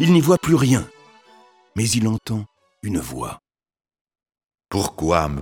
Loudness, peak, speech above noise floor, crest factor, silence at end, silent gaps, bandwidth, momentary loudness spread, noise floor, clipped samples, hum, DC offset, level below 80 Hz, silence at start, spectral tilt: -20 LUFS; -2 dBFS; 33 dB; 20 dB; 0 s; 4.01-4.05 s; 18 kHz; 17 LU; -52 dBFS; under 0.1%; none; under 0.1%; -44 dBFS; 0 s; -5.5 dB/octave